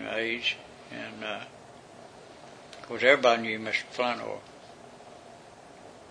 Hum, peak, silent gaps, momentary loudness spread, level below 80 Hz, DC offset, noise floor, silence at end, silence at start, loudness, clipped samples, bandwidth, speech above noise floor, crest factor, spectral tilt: none; -4 dBFS; none; 27 LU; -70 dBFS; under 0.1%; -50 dBFS; 0 s; 0 s; -28 LUFS; under 0.1%; 10.5 kHz; 22 dB; 26 dB; -3.5 dB/octave